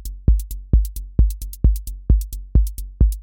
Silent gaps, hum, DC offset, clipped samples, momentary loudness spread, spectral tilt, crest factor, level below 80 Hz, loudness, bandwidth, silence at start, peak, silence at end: none; none; under 0.1%; under 0.1%; 3 LU; -8 dB/octave; 14 dB; -18 dBFS; -22 LUFS; 17 kHz; 0 s; -4 dBFS; 0 s